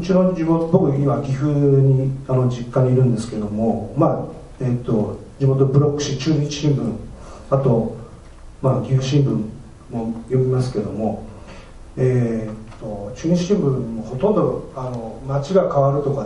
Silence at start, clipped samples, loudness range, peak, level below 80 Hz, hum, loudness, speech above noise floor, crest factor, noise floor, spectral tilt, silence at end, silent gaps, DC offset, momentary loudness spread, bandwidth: 0 s; under 0.1%; 5 LU; -2 dBFS; -42 dBFS; none; -20 LUFS; 21 dB; 18 dB; -39 dBFS; -8 dB/octave; 0 s; none; under 0.1%; 14 LU; 10 kHz